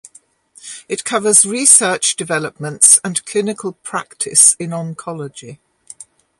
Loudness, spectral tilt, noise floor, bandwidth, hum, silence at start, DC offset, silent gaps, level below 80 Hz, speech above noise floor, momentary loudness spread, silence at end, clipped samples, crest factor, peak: -12 LUFS; -1.5 dB/octave; -49 dBFS; 16 kHz; none; 0.65 s; under 0.1%; none; -64 dBFS; 34 dB; 19 LU; 0.35 s; 0.2%; 16 dB; 0 dBFS